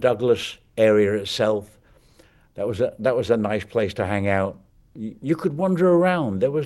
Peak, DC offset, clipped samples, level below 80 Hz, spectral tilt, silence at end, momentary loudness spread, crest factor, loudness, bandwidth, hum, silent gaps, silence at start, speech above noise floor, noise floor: -4 dBFS; under 0.1%; under 0.1%; -56 dBFS; -6.5 dB/octave; 0 s; 12 LU; 16 dB; -22 LUFS; 12.5 kHz; none; none; 0 s; 34 dB; -55 dBFS